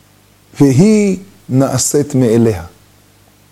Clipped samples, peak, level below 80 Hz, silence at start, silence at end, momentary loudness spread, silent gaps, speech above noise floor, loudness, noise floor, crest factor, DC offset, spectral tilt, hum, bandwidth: under 0.1%; 0 dBFS; -46 dBFS; 0.55 s; 0.85 s; 8 LU; none; 37 dB; -12 LUFS; -48 dBFS; 14 dB; under 0.1%; -6 dB/octave; 50 Hz at -40 dBFS; 16 kHz